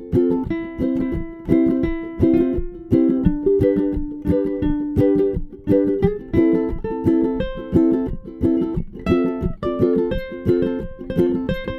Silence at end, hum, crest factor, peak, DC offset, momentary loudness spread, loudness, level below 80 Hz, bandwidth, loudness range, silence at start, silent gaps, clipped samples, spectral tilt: 0 s; none; 16 dB; -2 dBFS; under 0.1%; 8 LU; -20 LUFS; -32 dBFS; 5.6 kHz; 2 LU; 0 s; none; under 0.1%; -10 dB/octave